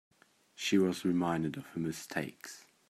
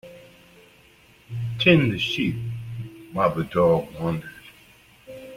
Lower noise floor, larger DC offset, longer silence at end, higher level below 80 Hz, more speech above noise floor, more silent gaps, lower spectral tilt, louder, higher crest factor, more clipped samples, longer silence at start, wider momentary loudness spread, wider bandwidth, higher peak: first, -59 dBFS vs -54 dBFS; neither; first, 0.3 s vs 0 s; second, -72 dBFS vs -54 dBFS; second, 25 dB vs 33 dB; neither; second, -5 dB/octave vs -6.5 dB/octave; second, -34 LUFS vs -23 LUFS; about the same, 18 dB vs 22 dB; neither; first, 0.6 s vs 0.05 s; second, 13 LU vs 19 LU; about the same, 15 kHz vs 16 kHz; second, -16 dBFS vs -4 dBFS